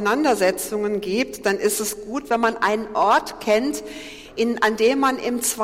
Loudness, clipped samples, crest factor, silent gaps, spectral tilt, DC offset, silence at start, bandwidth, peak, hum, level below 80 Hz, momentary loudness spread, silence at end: -21 LUFS; under 0.1%; 14 dB; none; -3 dB/octave; under 0.1%; 0 s; 16.5 kHz; -6 dBFS; none; -54 dBFS; 8 LU; 0 s